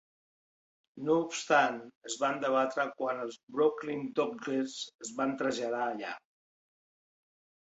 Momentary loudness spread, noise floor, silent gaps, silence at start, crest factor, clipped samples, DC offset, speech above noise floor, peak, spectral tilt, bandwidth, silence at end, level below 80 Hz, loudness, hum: 12 LU; under -90 dBFS; 1.95-2.01 s, 3.43-3.47 s, 4.94-4.99 s; 0.95 s; 22 dB; under 0.1%; under 0.1%; over 58 dB; -12 dBFS; -3.5 dB/octave; 8.2 kHz; 1.55 s; -78 dBFS; -32 LUFS; none